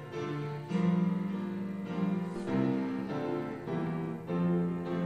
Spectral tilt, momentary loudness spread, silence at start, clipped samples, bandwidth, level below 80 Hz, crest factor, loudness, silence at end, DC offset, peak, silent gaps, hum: -9 dB/octave; 7 LU; 0 s; under 0.1%; 8.4 kHz; -68 dBFS; 14 dB; -33 LUFS; 0 s; under 0.1%; -18 dBFS; none; none